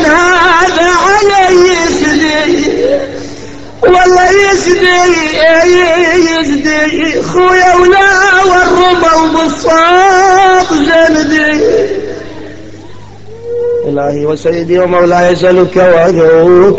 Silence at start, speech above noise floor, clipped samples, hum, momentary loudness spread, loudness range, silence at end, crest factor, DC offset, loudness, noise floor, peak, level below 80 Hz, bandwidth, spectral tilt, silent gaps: 0 s; 24 dB; 0.2%; none; 8 LU; 6 LU; 0 s; 8 dB; under 0.1%; -7 LUFS; -30 dBFS; 0 dBFS; -34 dBFS; 8.2 kHz; -4 dB/octave; none